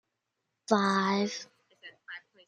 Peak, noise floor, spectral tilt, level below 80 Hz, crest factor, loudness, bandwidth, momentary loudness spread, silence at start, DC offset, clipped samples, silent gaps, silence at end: -8 dBFS; -84 dBFS; -5 dB/octave; -78 dBFS; 24 dB; -28 LUFS; 10.5 kHz; 23 LU; 0.7 s; under 0.1%; under 0.1%; none; 0.3 s